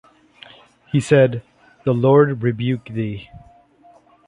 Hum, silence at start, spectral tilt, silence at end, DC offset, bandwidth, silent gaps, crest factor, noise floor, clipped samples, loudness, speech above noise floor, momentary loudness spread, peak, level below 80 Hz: 60 Hz at -40 dBFS; 0.95 s; -7.5 dB/octave; 0.9 s; under 0.1%; 10.5 kHz; none; 18 dB; -51 dBFS; under 0.1%; -18 LUFS; 34 dB; 13 LU; -2 dBFS; -54 dBFS